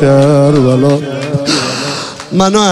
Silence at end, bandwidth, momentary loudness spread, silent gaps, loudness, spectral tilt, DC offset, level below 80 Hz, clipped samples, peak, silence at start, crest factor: 0 s; 12 kHz; 9 LU; none; -11 LUFS; -5.5 dB/octave; under 0.1%; -42 dBFS; under 0.1%; 0 dBFS; 0 s; 10 dB